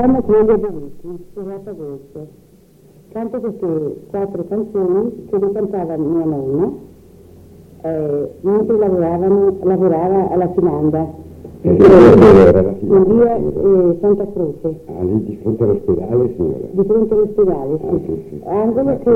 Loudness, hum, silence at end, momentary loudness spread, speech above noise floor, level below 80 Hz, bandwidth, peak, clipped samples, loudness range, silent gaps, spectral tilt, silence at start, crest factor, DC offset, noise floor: -14 LUFS; none; 0 s; 17 LU; 33 dB; -38 dBFS; 6.8 kHz; 0 dBFS; under 0.1%; 13 LU; none; -9.5 dB/octave; 0 s; 14 dB; under 0.1%; -46 dBFS